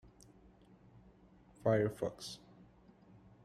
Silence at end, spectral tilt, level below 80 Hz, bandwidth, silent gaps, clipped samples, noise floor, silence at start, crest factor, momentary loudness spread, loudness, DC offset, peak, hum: 1.1 s; -6.5 dB/octave; -68 dBFS; 14.5 kHz; none; under 0.1%; -64 dBFS; 1.6 s; 24 dB; 15 LU; -37 LUFS; under 0.1%; -18 dBFS; none